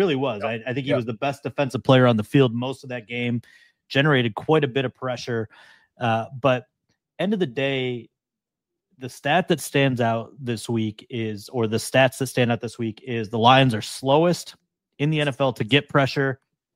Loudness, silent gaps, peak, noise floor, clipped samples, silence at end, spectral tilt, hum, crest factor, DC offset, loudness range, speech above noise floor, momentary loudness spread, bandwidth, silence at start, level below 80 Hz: -22 LUFS; none; -2 dBFS; -88 dBFS; under 0.1%; 0.4 s; -5.5 dB/octave; none; 20 dB; under 0.1%; 5 LU; 65 dB; 11 LU; 16 kHz; 0 s; -62 dBFS